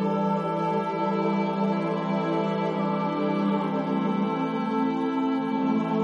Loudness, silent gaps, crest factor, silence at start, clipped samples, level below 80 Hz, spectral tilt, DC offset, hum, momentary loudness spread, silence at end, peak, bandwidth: -26 LUFS; none; 12 dB; 0 s; under 0.1%; -72 dBFS; -8.5 dB/octave; under 0.1%; none; 1 LU; 0 s; -14 dBFS; 7 kHz